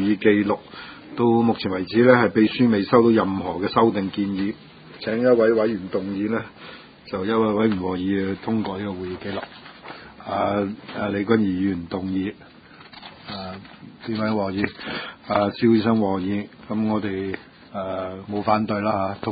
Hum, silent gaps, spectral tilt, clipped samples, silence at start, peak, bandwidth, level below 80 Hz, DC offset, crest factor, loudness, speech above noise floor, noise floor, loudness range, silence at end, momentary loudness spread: none; none; -11.5 dB/octave; under 0.1%; 0 s; 0 dBFS; 5 kHz; -52 dBFS; under 0.1%; 22 dB; -22 LUFS; 24 dB; -45 dBFS; 8 LU; 0 s; 18 LU